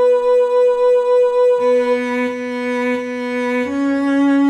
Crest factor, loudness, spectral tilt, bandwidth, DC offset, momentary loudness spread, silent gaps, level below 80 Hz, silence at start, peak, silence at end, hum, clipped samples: 8 dB; -16 LUFS; -5 dB/octave; 9.2 kHz; under 0.1%; 7 LU; none; -58 dBFS; 0 s; -6 dBFS; 0 s; none; under 0.1%